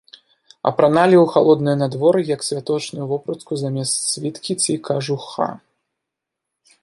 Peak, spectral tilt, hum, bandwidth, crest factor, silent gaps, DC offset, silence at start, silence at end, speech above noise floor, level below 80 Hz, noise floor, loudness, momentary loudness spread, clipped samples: 0 dBFS; -5 dB/octave; none; 11.5 kHz; 18 dB; none; under 0.1%; 0.65 s; 1.25 s; 64 dB; -64 dBFS; -82 dBFS; -19 LUFS; 12 LU; under 0.1%